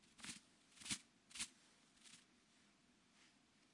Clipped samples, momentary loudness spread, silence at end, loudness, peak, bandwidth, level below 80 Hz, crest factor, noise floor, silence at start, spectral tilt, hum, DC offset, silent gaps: under 0.1%; 18 LU; 0 s; -51 LUFS; -30 dBFS; 12 kHz; -84 dBFS; 28 dB; -75 dBFS; 0 s; -0.5 dB/octave; none; under 0.1%; none